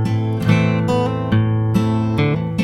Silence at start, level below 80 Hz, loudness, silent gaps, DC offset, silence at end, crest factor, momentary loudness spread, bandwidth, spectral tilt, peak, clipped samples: 0 s; -40 dBFS; -18 LUFS; none; under 0.1%; 0 s; 16 dB; 3 LU; 11.5 kHz; -8 dB/octave; -2 dBFS; under 0.1%